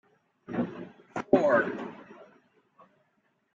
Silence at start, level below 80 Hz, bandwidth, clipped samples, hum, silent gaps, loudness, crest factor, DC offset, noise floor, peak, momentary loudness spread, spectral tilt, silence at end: 0.5 s; -70 dBFS; 7.6 kHz; under 0.1%; none; none; -28 LUFS; 24 dB; under 0.1%; -73 dBFS; -8 dBFS; 20 LU; -7.5 dB/octave; 1.3 s